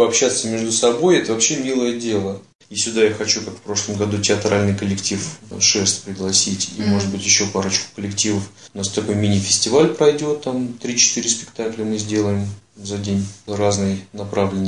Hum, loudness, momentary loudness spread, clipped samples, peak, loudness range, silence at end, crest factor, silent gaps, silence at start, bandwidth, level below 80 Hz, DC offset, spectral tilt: none; -18 LUFS; 11 LU; under 0.1%; -2 dBFS; 3 LU; 0 s; 16 dB; 2.55-2.59 s; 0 s; 11 kHz; -58 dBFS; 0.2%; -3.5 dB/octave